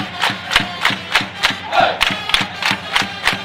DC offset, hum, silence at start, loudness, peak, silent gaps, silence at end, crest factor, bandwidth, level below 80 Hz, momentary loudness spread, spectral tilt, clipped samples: under 0.1%; none; 0 s; -16 LUFS; 0 dBFS; none; 0 s; 18 dB; 16 kHz; -42 dBFS; 4 LU; -2 dB/octave; under 0.1%